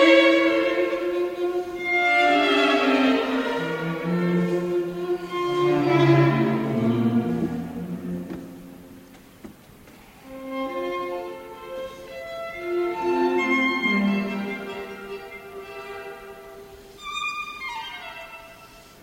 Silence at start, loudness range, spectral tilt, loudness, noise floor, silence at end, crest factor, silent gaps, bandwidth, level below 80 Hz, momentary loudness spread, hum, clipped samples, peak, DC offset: 0 s; 13 LU; -6.5 dB/octave; -23 LUFS; -48 dBFS; 0.2 s; 20 dB; none; 16 kHz; -58 dBFS; 20 LU; none; under 0.1%; -4 dBFS; under 0.1%